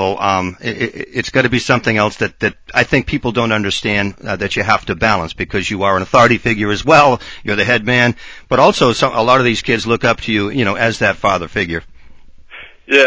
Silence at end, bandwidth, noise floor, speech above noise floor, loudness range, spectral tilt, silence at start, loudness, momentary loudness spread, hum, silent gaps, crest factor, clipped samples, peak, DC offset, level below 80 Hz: 0 s; 8 kHz; -37 dBFS; 22 dB; 4 LU; -5 dB/octave; 0 s; -14 LUFS; 9 LU; none; none; 14 dB; under 0.1%; 0 dBFS; under 0.1%; -38 dBFS